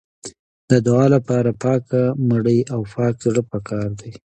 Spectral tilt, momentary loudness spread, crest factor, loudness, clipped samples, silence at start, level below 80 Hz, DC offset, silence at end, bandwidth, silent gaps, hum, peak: -8 dB/octave; 14 LU; 16 dB; -19 LUFS; under 0.1%; 0.25 s; -52 dBFS; under 0.1%; 0.15 s; 9.2 kHz; 0.39-0.68 s; none; -2 dBFS